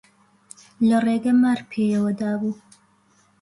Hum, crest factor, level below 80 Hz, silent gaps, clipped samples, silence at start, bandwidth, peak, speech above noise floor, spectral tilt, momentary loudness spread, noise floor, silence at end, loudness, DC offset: none; 12 dB; -64 dBFS; none; under 0.1%; 0.8 s; 11.5 kHz; -10 dBFS; 40 dB; -7 dB/octave; 8 LU; -60 dBFS; 0.9 s; -21 LUFS; under 0.1%